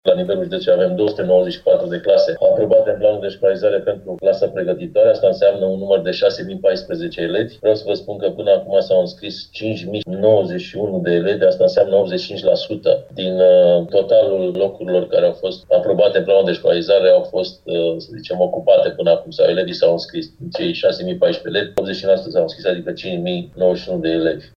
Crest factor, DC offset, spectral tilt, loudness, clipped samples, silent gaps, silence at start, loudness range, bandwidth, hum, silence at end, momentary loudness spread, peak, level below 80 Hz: 16 dB; under 0.1%; -7 dB/octave; -17 LUFS; under 0.1%; none; 0.05 s; 4 LU; 6.6 kHz; none; 0.15 s; 10 LU; -2 dBFS; -54 dBFS